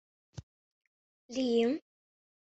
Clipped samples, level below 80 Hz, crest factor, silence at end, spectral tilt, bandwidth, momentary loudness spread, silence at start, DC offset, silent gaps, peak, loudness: under 0.1%; -68 dBFS; 20 dB; 0.75 s; -5 dB/octave; 8.2 kHz; 23 LU; 0.35 s; under 0.1%; 0.43-0.81 s, 0.87-1.29 s; -18 dBFS; -32 LUFS